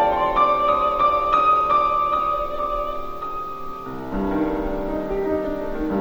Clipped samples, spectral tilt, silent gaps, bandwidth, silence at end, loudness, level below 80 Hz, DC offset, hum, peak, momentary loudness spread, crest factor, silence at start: under 0.1%; -7 dB/octave; none; over 20 kHz; 0 s; -21 LUFS; -38 dBFS; under 0.1%; none; -6 dBFS; 13 LU; 14 dB; 0 s